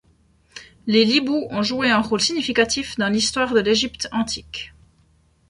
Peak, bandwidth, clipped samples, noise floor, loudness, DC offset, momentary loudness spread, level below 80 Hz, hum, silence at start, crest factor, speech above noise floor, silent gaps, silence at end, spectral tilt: -4 dBFS; 11.5 kHz; under 0.1%; -59 dBFS; -20 LUFS; under 0.1%; 15 LU; -50 dBFS; none; 0.55 s; 18 dB; 38 dB; none; 0.8 s; -3 dB/octave